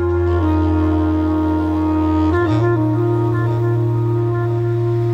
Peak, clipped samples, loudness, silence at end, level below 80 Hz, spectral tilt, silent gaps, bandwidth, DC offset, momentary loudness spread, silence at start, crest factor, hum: -6 dBFS; under 0.1%; -17 LUFS; 0 s; -32 dBFS; -10 dB/octave; none; 5.8 kHz; under 0.1%; 2 LU; 0 s; 10 dB; none